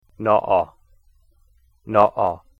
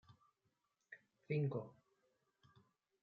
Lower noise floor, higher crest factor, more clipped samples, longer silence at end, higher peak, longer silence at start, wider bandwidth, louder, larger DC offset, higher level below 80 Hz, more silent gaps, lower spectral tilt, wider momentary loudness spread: second, -58 dBFS vs -86 dBFS; about the same, 20 dB vs 20 dB; neither; second, 0.25 s vs 1.3 s; first, -2 dBFS vs -30 dBFS; about the same, 0.2 s vs 0.1 s; about the same, 5.4 kHz vs 5 kHz; first, -20 LUFS vs -43 LUFS; neither; first, -54 dBFS vs -88 dBFS; neither; about the same, -8 dB/octave vs -8.5 dB/octave; second, 7 LU vs 21 LU